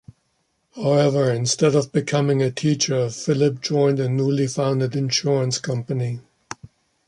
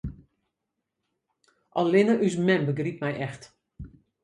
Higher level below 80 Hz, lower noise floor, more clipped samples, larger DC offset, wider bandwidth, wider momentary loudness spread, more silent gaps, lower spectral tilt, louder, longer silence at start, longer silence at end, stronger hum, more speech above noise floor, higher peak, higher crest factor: second, -60 dBFS vs -52 dBFS; second, -69 dBFS vs -83 dBFS; neither; neither; about the same, 11.5 kHz vs 10.5 kHz; second, 8 LU vs 25 LU; neither; second, -5.5 dB/octave vs -7 dB/octave; first, -21 LUFS vs -25 LUFS; first, 0.75 s vs 0.05 s; about the same, 0.4 s vs 0.35 s; neither; second, 49 dB vs 59 dB; first, -4 dBFS vs -8 dBFS; about the same, 16 dB vs 20 dB